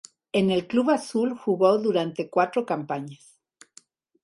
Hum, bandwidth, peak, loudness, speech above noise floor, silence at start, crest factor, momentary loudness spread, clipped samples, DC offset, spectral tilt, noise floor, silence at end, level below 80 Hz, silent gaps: none; 11.5 kHz; -8 dBFS; -24 LUFS; 33 dB; 0.35 s; 18 dB; 8 LU; under 0.1%; under 0.1%; -6 dB/octave; -56 dBFS; 1.1 s; -68 dBFS; none